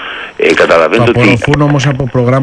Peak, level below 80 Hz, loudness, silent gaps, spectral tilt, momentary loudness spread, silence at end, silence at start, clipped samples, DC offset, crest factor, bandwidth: 0 dBFS; -34 dBFS; -9 LUFS; none; -6.5 dB/octave; 5 LU; 0 s; 0 s; 0.3%; under 0.1%; 8 dB; 10.5 kHz